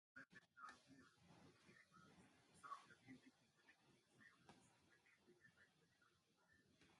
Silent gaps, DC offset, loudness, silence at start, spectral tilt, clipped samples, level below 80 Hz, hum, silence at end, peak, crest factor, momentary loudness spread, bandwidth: none; under 0.1%; -64 LUFS; 0.15 s; -4 dB/octave; under 0.1%; under -90 dBFS; none; 0 s; -44 dBFS; 24 dB; 8 LU; 11.5 kHz